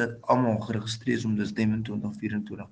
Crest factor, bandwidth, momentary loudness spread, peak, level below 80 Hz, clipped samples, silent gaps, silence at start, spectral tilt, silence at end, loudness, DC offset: 20 dB; 9.4 kHz; 8 LU; -8 dBFS; -60 dBFS; under 0.1%; none; 0 s; -6.5 dB/octave; 0.05 s; -28 LUFS; under 0.1%